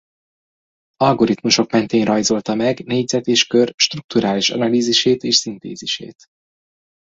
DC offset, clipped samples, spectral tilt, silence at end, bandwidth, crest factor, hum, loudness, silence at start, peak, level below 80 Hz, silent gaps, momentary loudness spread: under 0.1%; under 0.1%; -3.5 dB/octave; 1.1 s; 8 kHz; 18 dB; none; -17 LUFS; 1 s; 0 dBFS; -58 dBFS; 3.74-3.78 s, 4.04-4.09 s; 9 LU